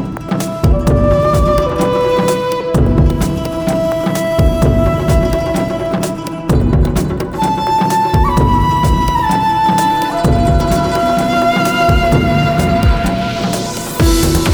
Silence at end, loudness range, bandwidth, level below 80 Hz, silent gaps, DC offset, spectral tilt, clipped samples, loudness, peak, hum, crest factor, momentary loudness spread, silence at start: 0 s; 2 LU; over 20 kHz; -20 dBFS; none; under 0.1%; -6 dB/octave; under 0.1%; -13 LUFS; 0 dBFS; none; 12 dB; 5 LU; 0 s